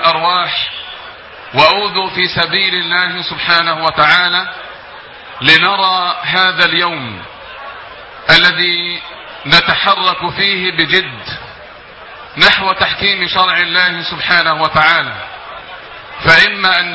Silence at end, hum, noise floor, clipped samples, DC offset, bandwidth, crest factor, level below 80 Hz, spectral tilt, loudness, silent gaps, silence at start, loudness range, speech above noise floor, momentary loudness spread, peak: 0 s; none; -34 dBFS; 0.2%; under 0.1%; 8 kHz; 14 dB; -44 dBFS; -4 dB/octave; -11 LUFS; none; 0 s; 2 LU; 22 dB; 21 LU; 0 dBFS